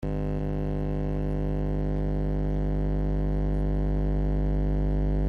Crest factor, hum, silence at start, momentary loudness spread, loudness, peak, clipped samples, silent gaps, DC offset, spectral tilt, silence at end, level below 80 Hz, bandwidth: 10 dB; 50 Hz at -25 dBFS; 0 s; 2 LU; -29 LUFS; -16 dBFS; under 0.1%; none; under 0.1%; -10.5 dB/octave; 0 s; -28 dBFS; 4.4 kHz